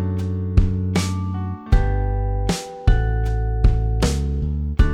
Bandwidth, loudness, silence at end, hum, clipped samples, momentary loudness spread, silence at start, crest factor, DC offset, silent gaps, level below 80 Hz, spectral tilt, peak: 12.5 kHz; -22 LUFS; 0 s; none; under 0.1%; 4 LU; 0 s; 16 dB; under 0.1%; none; -22 dBFS; -6.5 dB/octave; -2 dBFS